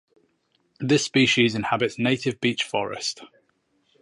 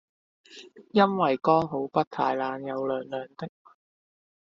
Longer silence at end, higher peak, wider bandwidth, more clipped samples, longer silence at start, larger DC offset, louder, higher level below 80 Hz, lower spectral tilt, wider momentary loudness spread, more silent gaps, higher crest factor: second, 0.75 s vs 1.1 s; about the same, -6 dBFS vs -6 dBFS; first, 11.5 kHz vs 7.6 kHz; neither; first, 0.8 s vs 0.5 s; neither; first, -23 LUFS vs -26 LUFS; first, -62 dBFS vs -68 dBFS; about the same, -4 dB/octave vs -5 dB/octave; second, 11 LU vs 19 LU; second, none vs 2.07-2.11 s; about the same, 20 dB vs 22 dB